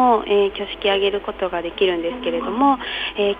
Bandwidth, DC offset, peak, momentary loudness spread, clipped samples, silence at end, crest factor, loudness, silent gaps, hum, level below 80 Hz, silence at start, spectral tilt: 5 kHz; under 0.1%; -4 dBFS; 7 LU; under 0.1%; 0 s; 16 dB; -20 LUFS; none; none; -46 dBFS; 0 s; -6.5 dB/octave